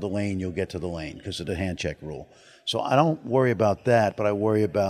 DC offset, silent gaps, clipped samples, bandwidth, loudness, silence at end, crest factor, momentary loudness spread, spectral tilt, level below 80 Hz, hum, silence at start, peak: under 0.1%; none; under 0.1%; 14 kHz; -25 LUFS; 0 s; 20 dB; 12 LU; -6.5 dB/octave; -52 dBFS; none; 0 s; -4 dBFS